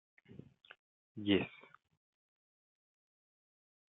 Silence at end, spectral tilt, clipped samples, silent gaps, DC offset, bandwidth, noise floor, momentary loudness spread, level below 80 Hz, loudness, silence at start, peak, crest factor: 2.35 s; -4 dB/octave; under 0.1%; 0.79-1.15 s; under 0.1%; 4 kHz; under -90 dBFS; 25 LU; -82 dBFS; -36 LUFS; 0.3 s; -20 dBFS; 26 dB